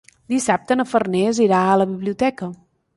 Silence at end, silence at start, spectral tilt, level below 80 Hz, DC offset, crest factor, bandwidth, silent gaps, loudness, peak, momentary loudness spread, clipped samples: 0.4 s; 0.3 s; -5.5 dB/octave; -58 dBFS; under 0.1%; 16 dB; 11.5 kHz; none; -19 LUFS; -4 dBFS; 7 LU; under 0.1%